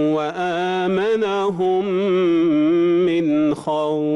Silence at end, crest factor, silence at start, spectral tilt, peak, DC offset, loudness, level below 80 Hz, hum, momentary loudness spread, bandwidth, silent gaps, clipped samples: 0 s; 8 dB; 0 s; -7 dB/octave; -12 dBFS; under 0.1%; -19 LUFS; -60 dBFS; none; 5 LU; 11 kHz; none; under 0.1%